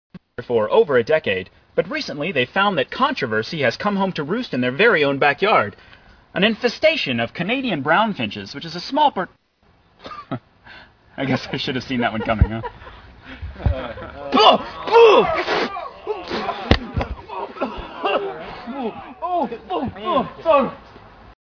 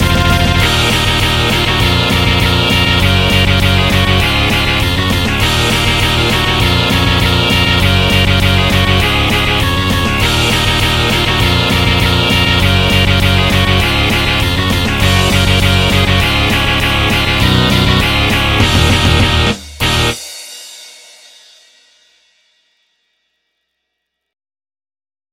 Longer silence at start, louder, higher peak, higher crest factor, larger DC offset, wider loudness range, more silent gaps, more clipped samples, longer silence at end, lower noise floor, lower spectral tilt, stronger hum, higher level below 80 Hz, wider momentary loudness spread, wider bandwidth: first, 0.15 s vs 0 s; second, -20 LUFS vs -11 LUFS; about the same, 0 dBFS vs 0 dBFS; first, 20 dB vs 12 dB; neither; first, 8 LU vs 2 LU; neither; neither; second, 0.1 s vs 4.45 s; second, -58 dBFS vs -73 dBFS; first, -6 dB/octave vs -4.5 dB/octave; neither; second, -38 dBFS vs -22 dBFS; first, 16 LU vs 3 LU; second, 5.4 kHz vs 17 kHz